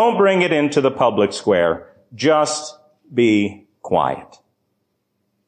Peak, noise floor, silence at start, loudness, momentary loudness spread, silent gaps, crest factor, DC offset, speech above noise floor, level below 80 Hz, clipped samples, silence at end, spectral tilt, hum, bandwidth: -4 dBFS; -71 dBFS; 0 s; -18 LUFS; 11 LU; none; 14 dB; under 0.1%; 54 dB; -54 dBFS; under 0.1%; 1.25 s; -5 dB/octave; none; 10 kHz